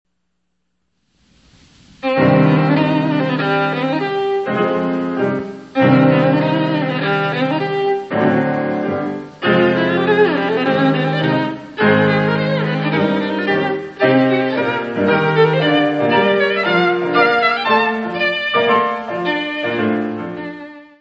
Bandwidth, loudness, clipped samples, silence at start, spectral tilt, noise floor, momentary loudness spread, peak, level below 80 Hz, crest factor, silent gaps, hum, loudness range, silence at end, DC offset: 7.4 kHz; -16 LUFS; under 0.1%; 2.05 s; -8 dB/octave; -72 dBFS; 7 LU; 0 dBFS; -58 dBFS; 16 dB; none; none; 3 LU; 0.15 s; under 0.1%